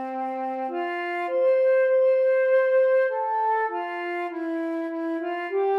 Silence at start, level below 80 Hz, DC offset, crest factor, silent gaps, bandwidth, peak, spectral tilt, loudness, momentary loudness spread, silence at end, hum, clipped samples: 0 s; under -90 dBFS; under 0.1%; 10 dB; none; 4.5 kHz; -12 dBFS; -4 dB/octave; -24 LUFS; 9 LU; 0 s; none; under 0.1%